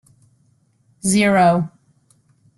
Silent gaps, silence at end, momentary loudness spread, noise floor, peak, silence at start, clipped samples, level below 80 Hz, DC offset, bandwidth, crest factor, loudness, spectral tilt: none; 0.9 s; 12 LU; -60 dBFS; -2 dBFS; 1.05 s; under 0.1%; -58 dBFS; under 0.1%; 12.5 kHz; 18 dB; -16 LUFS; -5 dB/octave